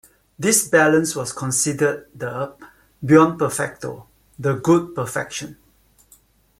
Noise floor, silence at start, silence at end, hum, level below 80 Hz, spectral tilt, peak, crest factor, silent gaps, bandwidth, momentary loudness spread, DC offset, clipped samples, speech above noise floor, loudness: -57 dBFS; 0.4 s; 1.05 s; none; -58 dBFS; -4.5 dB/octave; 0 dBFS; 20 dB; none; 16 kHz; 17 LU; under 0.1%; under 0.1%; 38 dB; -19 LUFS